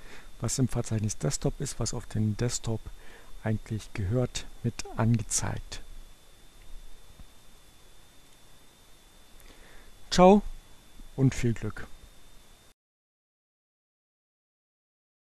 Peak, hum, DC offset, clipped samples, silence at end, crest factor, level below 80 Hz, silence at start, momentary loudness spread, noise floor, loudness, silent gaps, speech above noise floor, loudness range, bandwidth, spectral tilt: -6 dBFS; none; under 0.1%; under 0.1%; 2.95 s; 24 dB; -44 dBFS; 0 s; 19 LU; -54 dBFS; -29 LUFS; none; 27 dB; 10 LU; 13 kHz; -5.5 dB/octave